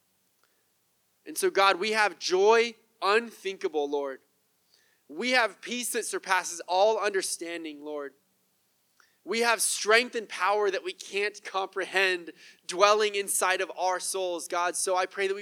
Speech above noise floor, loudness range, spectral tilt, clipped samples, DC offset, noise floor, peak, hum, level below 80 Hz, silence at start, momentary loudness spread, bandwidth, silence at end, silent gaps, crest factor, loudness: 44 dB; 4 LU; -1 dB/octave; under 0.1%; under 0.1%; -71 dBFS; -4 dBFS; none; under -90 dBFS; 1.25 s; 14 LU; 18.5 kHz; 0 s; none; 24 dB; -27 LUFS